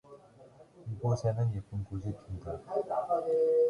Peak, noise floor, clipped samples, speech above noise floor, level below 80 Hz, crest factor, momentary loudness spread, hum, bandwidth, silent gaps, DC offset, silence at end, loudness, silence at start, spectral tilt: -18 dBFS; -57 dBFS; under 0.1%; 26 dB; -54 dBFS; 14 dB; 12 LU; none; 10.5 kHz; none; under 0.1%; 0 s; -34 LUFS; 0.1 s; -8.5 dB/octave